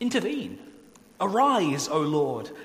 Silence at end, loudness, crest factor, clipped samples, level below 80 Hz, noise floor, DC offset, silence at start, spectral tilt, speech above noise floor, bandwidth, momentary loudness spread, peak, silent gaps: 0 s; -25 LUFS; 16 dB; under 0.1%; -70 dBFS; -52 dBFS; under 0.1%; 0 s; -4.5 dB/octave; 27 dB; 15.5 kHz; 12 LU; -10 dBFS; none